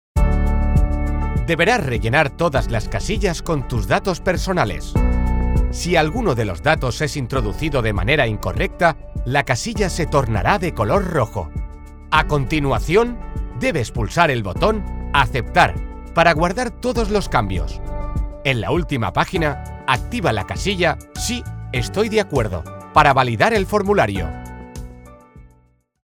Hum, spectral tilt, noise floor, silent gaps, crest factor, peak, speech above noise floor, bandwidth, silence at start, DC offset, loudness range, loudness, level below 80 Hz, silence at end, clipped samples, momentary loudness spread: none; -5.5 dB/octave; -57 dBFS; none; 18 dB; 0 dBFS; 38 dB; 18 kHz; 0.15 s; under 0.1%; 3 LU; -19 LUFS; -26 dBFS; 0.6 s; under 0.1%; 10 LU